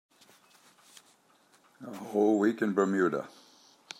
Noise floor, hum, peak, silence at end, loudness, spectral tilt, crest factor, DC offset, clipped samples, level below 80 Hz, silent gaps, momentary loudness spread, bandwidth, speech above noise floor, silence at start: -65 dBFS; none; -12 dBFS; 0.7 s; -28 LUFS; -6.5 dB/octave; 20 dB; under 0.1%; under 0.1%; -86 dBFS; none; 20 LU; 15.5 kHz; 37 dB; 1.8 s